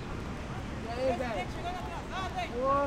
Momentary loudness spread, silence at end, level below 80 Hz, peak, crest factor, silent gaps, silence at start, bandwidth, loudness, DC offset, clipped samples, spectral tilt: 7 LU; 0 s; -44 dBFS; -18 dBFS; 16 dB; none; 0 s; 15.5 kHz; -35 LUFS; under 0.1%; under 0.1%; -6 dB/octave